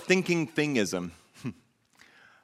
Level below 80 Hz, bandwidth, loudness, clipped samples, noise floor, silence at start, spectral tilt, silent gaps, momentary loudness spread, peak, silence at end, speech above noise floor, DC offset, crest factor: -68 dBFS; 15 kHz; -28 LUFS; under 0.1%; -61 dBFS; 0 s; -5 dB/octave; none; 16 LU; -8 dBFS; 0.9 s; 34 dB; under 0.1%; 24 dB